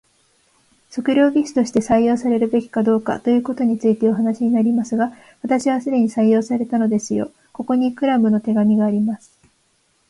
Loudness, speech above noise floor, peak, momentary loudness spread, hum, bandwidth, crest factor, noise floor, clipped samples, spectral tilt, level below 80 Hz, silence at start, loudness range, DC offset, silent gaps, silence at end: -18 LUFS; 45 dB; -4 dBFS; 8 LU; none; 11.5 kHz; 14 dB; -63 dBFS; under 0.1%; -6.5 dB/octave; -58 dBFS; 0.9 s; 2 LU; under 0.1%; none; 0.95 s